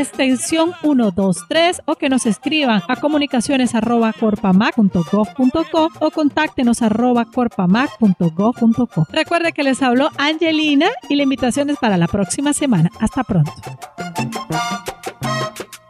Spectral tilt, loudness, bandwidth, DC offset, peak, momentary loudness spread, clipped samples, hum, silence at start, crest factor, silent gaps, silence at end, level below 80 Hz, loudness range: -5 dB/octave; -17 LUFS; 14.5 kHz; under 0.1%; -2 dBFS; 7 LU; under 0.1%; none; 0 s; 14 dB; none; 0.15 s; -48 dBFS; 3 LU